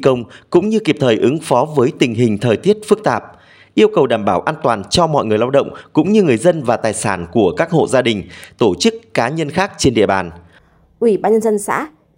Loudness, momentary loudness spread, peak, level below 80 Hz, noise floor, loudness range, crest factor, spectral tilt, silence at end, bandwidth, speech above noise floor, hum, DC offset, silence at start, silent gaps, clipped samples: -15 LUFS; 6 LU; 0 dBFS; -48 dBFS; -50 dBFS; 2 LU; 14 dB; -5.5 dB/octave; 0.3 s; 16 kHz; 35 dB; none; under 0.1%; 0 s; none; under 0.1%